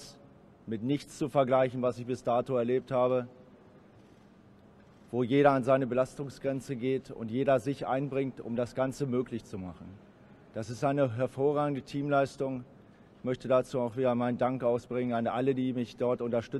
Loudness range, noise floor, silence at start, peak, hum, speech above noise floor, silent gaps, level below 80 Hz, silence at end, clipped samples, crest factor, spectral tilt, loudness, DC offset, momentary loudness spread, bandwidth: 4 LU; -57 dBFS; 0 s; -10 dBFS; none; 27 dB; none; -66 dBFS; 0 s; under 0.1%; 22 dB; -7.5 dB/octave; -31 LUFS; under 0.1%; 12 LU; 12.5 kHz